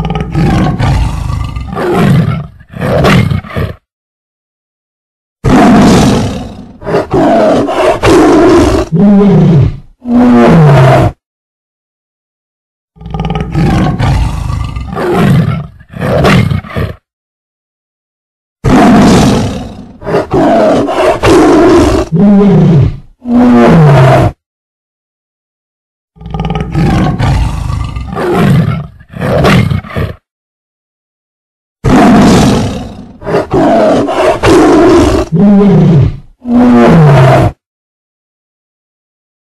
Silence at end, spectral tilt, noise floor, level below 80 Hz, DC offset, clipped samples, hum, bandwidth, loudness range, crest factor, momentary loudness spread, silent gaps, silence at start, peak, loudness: 1.9 s; -7 dB/octave; under -90 dBFS; -22 dBFS; under 0.1%; under 0.1%; none; 13 kHz; 8 LU; 8 dB; 14 LU; 3.92-5.36 s, 11.26-12.88 s, 17.13-18.56 s, 24.46-26.08 s, 30.31-31.76 s; 0 s; 0 dBFS; -7 LUFS